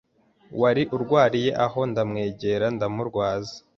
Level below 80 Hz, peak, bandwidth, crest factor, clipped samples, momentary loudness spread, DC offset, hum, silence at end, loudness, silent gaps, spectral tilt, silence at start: -56 dBFS; -6 dBFS; 7.4 kHz; 18 dB; under 0.1%; 7 LU; under 0.1%; none; 0.2 s; -24 LUFS; none; -6.5 dB/octave; 0.5 s